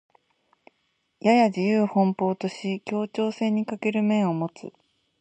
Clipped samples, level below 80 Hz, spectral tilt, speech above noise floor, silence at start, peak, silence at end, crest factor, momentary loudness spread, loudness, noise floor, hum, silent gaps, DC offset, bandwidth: under 0.1%; -74 dBFS; -7 dB/octave; 49 dB; 1.25 s; -4 dBFS; 0.5 s; 20 dB; 10 LU; -24 LUFS; -73 dBFS; none; none; under 0.1%; 8.6 kHz